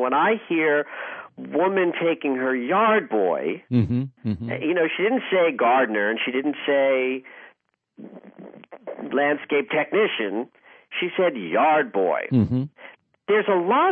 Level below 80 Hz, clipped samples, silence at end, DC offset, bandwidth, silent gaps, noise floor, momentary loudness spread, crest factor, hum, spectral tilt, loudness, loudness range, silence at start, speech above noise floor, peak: -60 dBFS; under 0.1%; 0 s; under 0.1%; 4.5 kHz; none; -62 dBFS; 12 LU; 14 dB; none; -9.5 dB/octave; -22 LUFS; 4 LU; 0 s; 40 dB; -8 dBFS